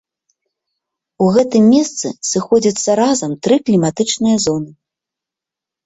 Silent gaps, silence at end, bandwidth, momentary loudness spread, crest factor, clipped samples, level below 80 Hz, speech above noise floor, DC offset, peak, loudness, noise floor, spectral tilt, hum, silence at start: none; 1.15 s; 8.2 kHz; 8 LU; 14 dB; under 0.1%; -56 dBFS; 72 dB; under 0.1%; -2 dBFS; -14 LUFS; -86 dBFS; -5 dB/octave; none; 1.2 s